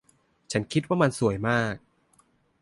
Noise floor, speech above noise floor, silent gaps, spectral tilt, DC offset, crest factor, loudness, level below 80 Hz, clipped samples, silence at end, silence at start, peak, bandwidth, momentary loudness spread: -64 dBFS; 40 dB; none; -6 dB/octave; under 0.1%; 20 dB; -26 LUFS; -56 dBFS; under 0.1%; 0.85 s; 0.5 s; -8 dBFS; 11.5 kHz; 8 LU